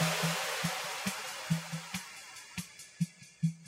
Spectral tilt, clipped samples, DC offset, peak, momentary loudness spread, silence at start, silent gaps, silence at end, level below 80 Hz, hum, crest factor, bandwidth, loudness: -3.5 dB/octave; under 0.1%; under 0.1%; -18 dBFS; 12 LU; 0 s; none; 0 s; -70 dBFS; none; 18 dB; 16 kHz; -36 LUFS